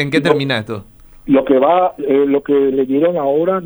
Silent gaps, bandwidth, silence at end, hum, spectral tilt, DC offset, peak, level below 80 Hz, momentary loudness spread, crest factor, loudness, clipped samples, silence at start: none; over 20 kHz; 0 s; none; -7 dB/octave; under 0.1%; 0 dBFS; -48 dBFS; 8 LU; 14 dB; -14 LUFS; under 0.1%; 0 s